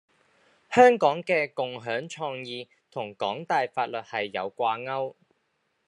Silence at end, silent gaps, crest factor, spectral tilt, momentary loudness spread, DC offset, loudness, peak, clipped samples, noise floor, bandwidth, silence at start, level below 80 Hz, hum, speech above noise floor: 0.75 s; none; 24 dB; -4.5 dB/octave; 18 LU; under 0.1%; -26 LUFS; -2 dBFS; under 0.1%; -74 dBFS; 10.5 kHz; 0.7 s; -78 dBFS; none; 48 dB